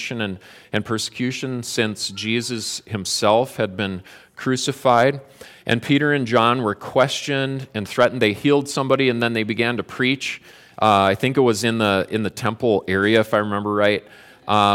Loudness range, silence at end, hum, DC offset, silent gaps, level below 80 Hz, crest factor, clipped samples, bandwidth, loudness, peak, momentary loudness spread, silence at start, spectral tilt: 3 LU; 0 s; none; under 0.1%; none; -62 dBFS; 18 dB; under 0.1%; 17 kHz; -20 LUFS; -2 dBFS; 10 LU; 0 s; -4.5 dB/octave